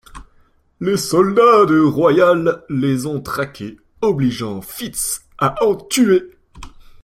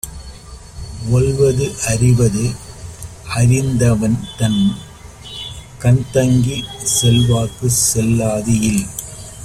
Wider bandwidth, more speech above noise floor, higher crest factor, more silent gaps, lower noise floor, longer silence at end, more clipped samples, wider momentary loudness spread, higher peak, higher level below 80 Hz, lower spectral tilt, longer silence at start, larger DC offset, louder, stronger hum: about the same, 16.5 kHz vs 15.5 kHz; first, 39 dB vs 20 dB; about the same, 16 dB vs 14 dB; neither; first, -54 dBFS vs -35 dBFS; first, 0.35 s vs 0 s; neither; second, 14 LU vs 19 LU; about the same, -2 dBFS vs -2 dBFS; second, -46 dBFS vs -36 dBFS; about the same, -5 dB/octave vs -5 dB/octave; about the same, 0.15 s vs 0.05 s; neither; about the same, -16 LUFS vs -15 LUFS; neither